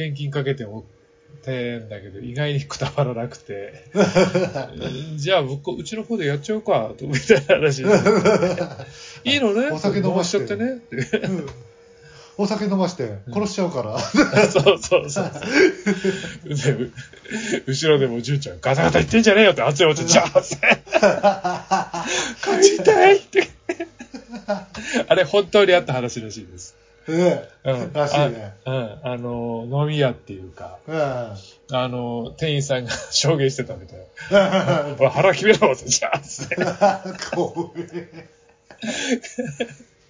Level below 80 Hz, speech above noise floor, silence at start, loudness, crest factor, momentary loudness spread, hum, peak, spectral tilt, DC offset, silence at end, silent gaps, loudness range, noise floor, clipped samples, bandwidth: -50 dBFS; 27 dB; 0 s; -20 LUFS; 20 dB; 17 LU; none; 0 dBFS; -4.5 dB/octave; under 0.1%; 0.35 s; none; 8 LU; -47 dBFS; under 0.1%; 7.6 kHz